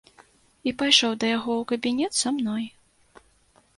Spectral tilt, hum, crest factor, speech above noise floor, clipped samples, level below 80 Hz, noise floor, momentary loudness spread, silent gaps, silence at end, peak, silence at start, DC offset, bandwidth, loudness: -2 dB/octave; none; 24 dB; 37 dB; under 0.1%; -64 dBFS; -61 dBFS; 13 LU; none; 1.1 s; -2 dBFS; 0.65 s; under 0.1%; 11.5 kHz; -23 LUFS